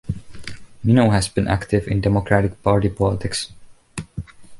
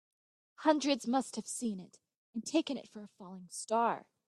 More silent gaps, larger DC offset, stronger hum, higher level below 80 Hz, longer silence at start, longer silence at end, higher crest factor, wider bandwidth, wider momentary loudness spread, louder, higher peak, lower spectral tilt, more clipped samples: second, none vs 2.17-2.33 s; neither; neither; first, -36 dBFS vs -84 dBFS; second, 0.05 s vs 0.6 s; second, 0 s vs 0.3 s; about the same, 18 dB vs 22 dB; about the same, 11.5 kHz vs 12.5 kHz; about the same, 19 LU vs 18 LU; first, -19 LUFS vs -34 LUFS; first, -2 dBFS vs -14 dBFS; first, -6 dB/octave vs -3.5 dB/octave; neither